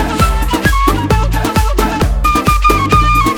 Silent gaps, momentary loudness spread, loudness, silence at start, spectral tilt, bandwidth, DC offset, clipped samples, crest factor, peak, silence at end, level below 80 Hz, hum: none; 4 LU; -12 LUFS; 0 s; -5 dB/octave; 20 kHz; under 0.1%; under 0.1%; 12 dB; 0 dBFS; 0 s; -16 dBFS; none